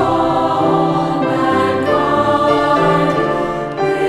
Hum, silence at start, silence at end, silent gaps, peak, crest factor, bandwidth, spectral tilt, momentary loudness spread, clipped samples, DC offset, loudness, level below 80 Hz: none; 0 s; 0 s; none; -2 dBFS; 14 dB; 13 kHz; -6.5 dB/octave; 5 LU; under 0.1%; under 0.1%; -15 LUFS; -42 dBFS